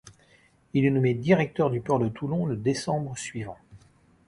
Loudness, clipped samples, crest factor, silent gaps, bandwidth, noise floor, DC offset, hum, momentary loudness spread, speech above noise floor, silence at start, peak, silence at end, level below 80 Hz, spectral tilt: -26 LUFS; under 0.1%; 20 dB; none; 11.5 kHz; -60 dBFS; under 0.1%; none; 12 LU; 35 dB; 0.05 s; -6 dBFS; 0.5 s; -58 dBFS; -6.5 dB/octave